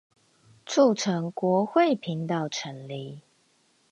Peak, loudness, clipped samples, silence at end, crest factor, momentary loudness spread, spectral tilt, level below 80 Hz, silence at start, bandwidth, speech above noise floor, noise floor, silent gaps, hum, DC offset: -8 dBFS; -25 LUFS; under 0.1%; 0.7 s; 20 dB; 15 LU; -5.5 dB/octave; -76 dBFS; 0.65 s; 10.5 kHz; 41 dB; -66 dBFS; none; none; under 0.1%